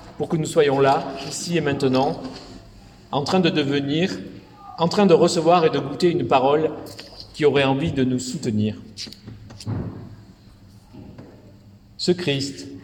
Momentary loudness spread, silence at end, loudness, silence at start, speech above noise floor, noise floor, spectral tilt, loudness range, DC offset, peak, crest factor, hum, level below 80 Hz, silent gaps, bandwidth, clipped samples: 21 LU; 0.05 s; -21 LUFS; 0 s; 27 dB; -48 dBFS; -5.5 dB/octave; 11 LU; under 0.1%; -4 dBFS; 18 dB; none; -52 dBFS; none; 17 kHz; under 0.1%